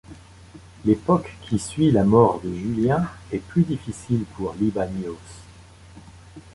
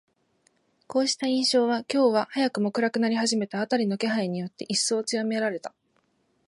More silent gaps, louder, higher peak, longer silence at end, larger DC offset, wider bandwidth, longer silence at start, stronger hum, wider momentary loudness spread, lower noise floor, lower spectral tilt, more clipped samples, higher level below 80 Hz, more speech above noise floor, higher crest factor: neither; first, -22 LUFS vs -25 LUFS; first, -2 dBFS vs -10 dBFS; second, 0.15 s vs 0.8 s; neither; about the same, 11.5 kHz vs 11.5 kHz; second, 0.1 s vs 0.9 s; neither; first, 14 LU vs 8 LU; second, -46 dBFS vs -70 dBFS; first, -7.5 dB/octave vs -3.5 dB/octave; neither; first, -46 dBFS vs -78 dBFS; second, 25 dB vs 45 dB; first, 22 dB vs 16 dB